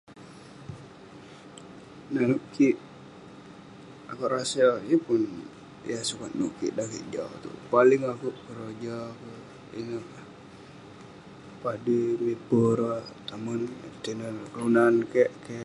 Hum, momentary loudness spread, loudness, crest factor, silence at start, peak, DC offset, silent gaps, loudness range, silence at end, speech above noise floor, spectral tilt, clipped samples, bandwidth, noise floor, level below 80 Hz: none; 25 LU; -27 LUFS; 22 dB; 0.1 s; -8 dBFS; under 0.1%; none; 7 LU; 0 s; 21 dB; -5.5 dB/octave; under 0.1%; 11.5 kHz; -47 dBFS; -66 dBFS